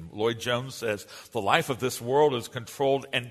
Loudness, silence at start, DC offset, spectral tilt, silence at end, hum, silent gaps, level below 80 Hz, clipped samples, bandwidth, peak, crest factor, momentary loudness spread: -27 LUFS; 0 s; under 0.1%; -4.5 dB/octave; 0 s; none; none; -64 dBFS; under 0.1%; 13.5 kHz; -4 dBFS; 24 dB; 9 LU